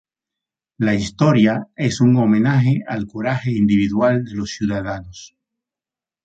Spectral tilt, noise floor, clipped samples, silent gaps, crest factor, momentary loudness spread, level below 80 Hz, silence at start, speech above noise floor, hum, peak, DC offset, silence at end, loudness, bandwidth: -7 dB/octave; -90 dBFS; under 0.1%; none; 16 dB; 11 LU; -48 dBFS; 0.8 s; 73 dB; none; -4 dBFS; under 0.1%; 1 s; -18 LUFS; 8.4 kHz